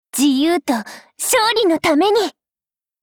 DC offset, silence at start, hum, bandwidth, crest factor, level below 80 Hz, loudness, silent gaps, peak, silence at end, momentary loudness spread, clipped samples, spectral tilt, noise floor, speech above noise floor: under 0.1%; 0.15 s; none; over 20 kHz; 14 dB; -58 dBFS; -16 LUFS; none; -4 dBFS; 0.75 s; 9 LU; under 0.1%; -2 dB/octave; under -90 dBFS; over 74 dB